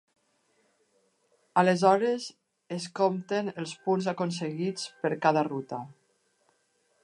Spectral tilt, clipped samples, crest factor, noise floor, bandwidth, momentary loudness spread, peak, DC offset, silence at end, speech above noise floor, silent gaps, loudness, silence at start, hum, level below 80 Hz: -5.5 dB/octave; under 0.1%; 22 dB; -71 dBFS; 11 kHz; 15 LU; -8 dBFS; under 0.1%; 1.1 s; 44 dB; none; -28 LUFS; 1.55 s; none; -82 dBFS